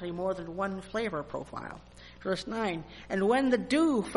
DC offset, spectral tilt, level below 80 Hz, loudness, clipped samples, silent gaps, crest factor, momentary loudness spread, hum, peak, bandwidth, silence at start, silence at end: under 0.1%; -5.5 dB/octave; -56 dBFS; -31 LUFS; under 0.1%; none; 18 dB; 14 LU; none; -14 dBFS; 11.5 kHz; 0 s; 0 s